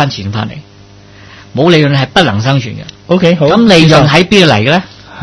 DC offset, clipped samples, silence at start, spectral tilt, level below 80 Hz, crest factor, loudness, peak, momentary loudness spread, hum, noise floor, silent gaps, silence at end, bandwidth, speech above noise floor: under 0.1%; 2%; 0 s; -6 dB/octave; -38 dBFS; 10 dB; -8 LUFS; 0 dBFS; 16 LU; none; -36 dBFS; none; 0 s; 11 kHz; 28 dB